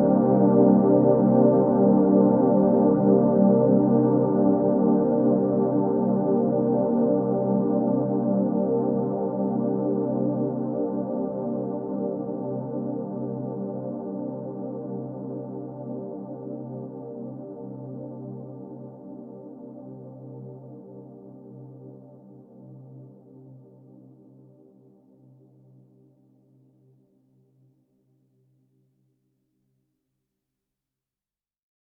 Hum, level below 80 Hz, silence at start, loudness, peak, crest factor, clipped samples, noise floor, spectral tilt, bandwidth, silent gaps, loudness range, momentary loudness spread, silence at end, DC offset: none; -62 dBFS; 0 s; -23 LUFS; -6 dBFS; 18 dB; under 0.1%; under -90 dBFS; -14 dB/octave; 2.1 kHz; none; 23 LU; 23 LU; 8.25 s; under 0.1%